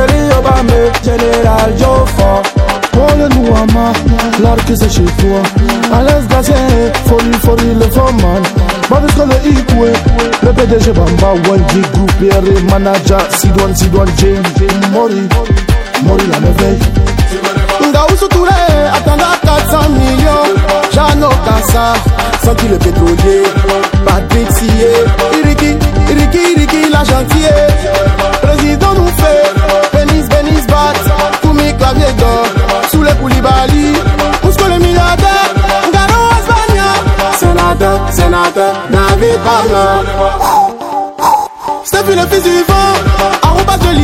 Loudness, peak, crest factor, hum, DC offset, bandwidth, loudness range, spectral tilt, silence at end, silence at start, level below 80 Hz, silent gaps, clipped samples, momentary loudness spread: -9 LUFS; 0 dBFS; 8 dB; none; under 0.1%; 17 kHz; 1 LU; -5.5 dB/octave; 0 s; 0 s; -14 dBFS; none; 2%; 3 LU